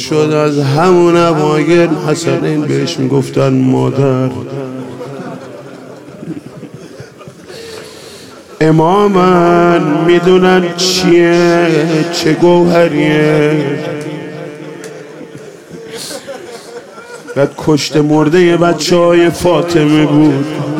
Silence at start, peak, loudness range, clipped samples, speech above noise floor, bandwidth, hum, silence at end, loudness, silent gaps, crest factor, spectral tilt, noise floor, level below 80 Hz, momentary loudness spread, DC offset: 0 s; 0 dBFS; 17 LU; under 0.1%; 23 dB; 15.5 kHz; none; 0 s; -10 LUFS; none; 12 dB; -6 dB/octave; -33 dBFS; -46 dBFS; 22 LU; under 0.1%